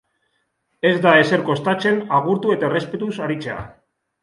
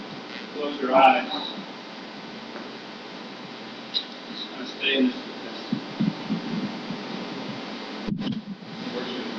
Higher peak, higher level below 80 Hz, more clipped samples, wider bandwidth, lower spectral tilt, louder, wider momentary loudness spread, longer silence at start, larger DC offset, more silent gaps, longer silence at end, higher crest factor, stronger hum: first, 0 dBFS vs -6 dBFS; first, -56 dBFS vs -64 dBFS; neither; first, 11.5 kHz vs 7.6 kHz; about the same, -6.5 dB/octave vs -5.5 dB/octave; first, -18 LUFS vs -28 LUFS; second, 13 LU vs 16 LU; first, 0.85 s vs 0 s; neither; neither; first, 0.5 s vs 0 s; about the same, 20 dB vs 22 dB; neither